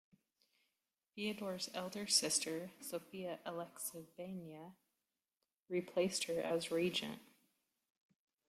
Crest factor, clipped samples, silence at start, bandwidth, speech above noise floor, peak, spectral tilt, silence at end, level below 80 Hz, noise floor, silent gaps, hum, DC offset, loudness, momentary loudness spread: 24 dB; under 0.1%; 1.15 s; 16 kHz; over 49 dB; -18 dBFS; -2.5 dB/octave; 1.25 s; -84 dBFS; under -90 dBFS; 5.58-5.66 s; none; under 0.1%; -40 LUFS; 16 LU